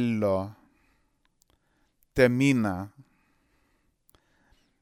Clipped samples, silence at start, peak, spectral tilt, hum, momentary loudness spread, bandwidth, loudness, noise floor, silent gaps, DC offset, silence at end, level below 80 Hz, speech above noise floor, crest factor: under 0.1%; 0 s; -6 dBFS; -6.5 dB/octave; none; 17 LU; 16 kHz; -25 LUFS; -70 dBFS; none; under 0.1%; 1.95 s; -56 dBFS; 46 dB; 24 dB